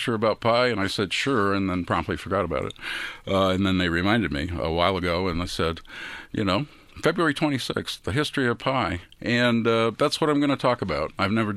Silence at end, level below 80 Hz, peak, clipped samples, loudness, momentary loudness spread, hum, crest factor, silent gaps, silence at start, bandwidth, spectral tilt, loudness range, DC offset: 0 s; -48 dBFS; -4 dBFS; under 0.1%; -24 LUFS; 7 LU; none; 20 dB; none; 0 s; 14 kHz; -5.5 dB/octave; 3 LU; under 0.1%